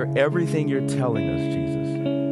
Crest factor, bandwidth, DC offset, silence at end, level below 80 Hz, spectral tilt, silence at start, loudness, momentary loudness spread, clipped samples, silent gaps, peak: 16 dB; 12 kHz; under 0.1%; 0 s; -48 dBFS; -7.5 dB/octave; 0 s; -24 LUFS; 4 LU; under 0.1%; none; -8 dBFS